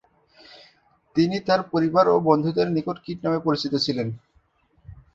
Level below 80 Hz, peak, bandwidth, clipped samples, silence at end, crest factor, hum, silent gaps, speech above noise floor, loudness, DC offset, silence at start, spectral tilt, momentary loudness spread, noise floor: -58 dBFS; -4 dBFS; 7.8 kHz; under 0.1%; 0.2 s; 20 dB; none; none; 42 dB; -22 LUFS; under 0.1%; 1.15 s; -7 dB/octave; 10 LU; -63 dBFS